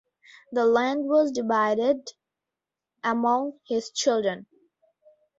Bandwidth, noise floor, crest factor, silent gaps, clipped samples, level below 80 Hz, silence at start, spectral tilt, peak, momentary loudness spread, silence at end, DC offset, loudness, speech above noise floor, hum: 8 kHz; -88 dBFS; 16 dB; none; under 0.1%; -72 dBFS; 0.5 s; -3.5 dB/octave; -10 dBFS; 9 LU; 0.95 s; under 0.1%; -25 LUFS; 64 dB; none